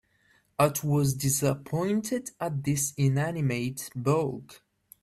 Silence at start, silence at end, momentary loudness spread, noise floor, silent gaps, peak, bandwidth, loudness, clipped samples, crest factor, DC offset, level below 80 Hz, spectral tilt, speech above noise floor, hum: 0.6 s; 0.45 s; 7 LU; -66 dBFS; none; -10 dBFS; 15 kHz; -28 LUFS; under 0.1%; 18 dB; under 0.1%; -58 dBFS; -5.5 dB/octave; 39 dB; none